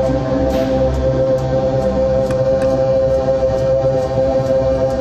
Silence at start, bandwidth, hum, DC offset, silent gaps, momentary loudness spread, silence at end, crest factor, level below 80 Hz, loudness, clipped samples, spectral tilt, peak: 0 s; 8.6 kHz; none; under 0.1%; none; 2 LU; 0 s; 12 dB; -28 dBFS; -16 LUFS; under 0.1%; -8 dB/octave; -4 dBFS